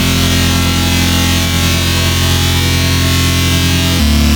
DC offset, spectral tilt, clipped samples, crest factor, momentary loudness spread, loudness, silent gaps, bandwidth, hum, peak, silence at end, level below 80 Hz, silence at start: under 0.1%; -4 dB/octave; under 0.1%; 10 dB; 1 LU; -11 LUFS; none; over 20 kHz; none; 0 dBFS; 0 s; -20 dBFS; 0 s